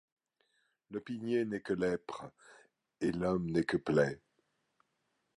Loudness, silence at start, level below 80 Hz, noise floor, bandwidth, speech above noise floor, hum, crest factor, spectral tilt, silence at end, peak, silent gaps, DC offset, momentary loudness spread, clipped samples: -35 LUFS; 0.9 s; -64 dBFS; -81 dBFS; 11.5 kHz; 47 dB; none; 22 dB; -7 dB/octave; 1.2 s; -14 dBFS; none; under 0.1%; 15 LU; under 0.1%